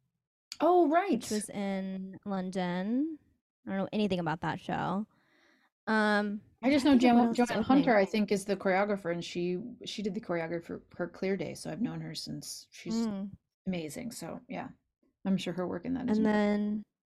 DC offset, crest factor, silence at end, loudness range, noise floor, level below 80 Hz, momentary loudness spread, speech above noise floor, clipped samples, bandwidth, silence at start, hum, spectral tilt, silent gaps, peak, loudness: under 0.1%; 18 dB; 0.2 s; 10 LU; -67 dBFS; -66 dBFS; 16 LU; 37 dB; under 0.1%; 14 kHz; 0.5 s; none; -5.5 dB/octave; 3.41-3.63 s, 5.72-5.87 s, 13.54-13.65 s; -12 dBFS; -31 LUFS